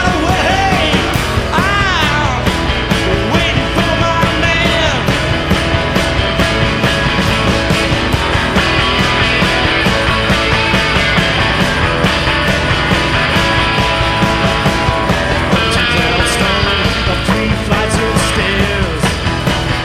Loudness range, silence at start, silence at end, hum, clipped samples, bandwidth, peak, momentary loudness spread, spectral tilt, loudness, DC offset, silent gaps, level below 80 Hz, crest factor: 1 LU; 0 s; 0 s; none; under 0.1%; 16 kHz; 0 dBFS; 3 LU; -4.5 dB/octave; -12 LUFS; under 0.1%; none; -22 dBFS; 12 dB